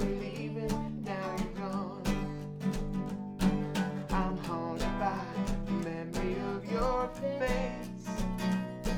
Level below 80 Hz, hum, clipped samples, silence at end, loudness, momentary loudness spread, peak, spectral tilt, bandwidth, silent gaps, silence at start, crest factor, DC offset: -42 dBFS; none; under 0.1%; 0 s; -35 LUFS; 5 LU; -16 dBFS; -6.5 dB/octave; 17 kHz; none; 0 s; 18 dB; under 0.1%